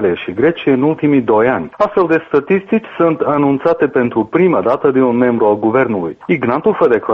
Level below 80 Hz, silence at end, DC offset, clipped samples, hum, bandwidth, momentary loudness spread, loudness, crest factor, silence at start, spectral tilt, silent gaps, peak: -52 dBFS; 0 s; under 0.1%; under 0.1%; none; 5.8 kHz; 4 LU; -14 LUFS; 12 dB; 0 s; -9 dB/octave; none; -2 dBFS